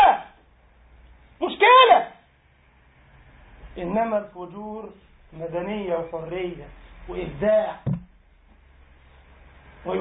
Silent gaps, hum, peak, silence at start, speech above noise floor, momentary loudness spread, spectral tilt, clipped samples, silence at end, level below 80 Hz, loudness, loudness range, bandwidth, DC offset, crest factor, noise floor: none; none; -2 dBFS; 0 s; 31 dB; 23 LU; -9.5 dB/octave; under 0.1%; 0 s; -50 dBFS; -21 LUFS; 11 LU; 4 kHz; under 0.1%; 22 dB; -58 dBFS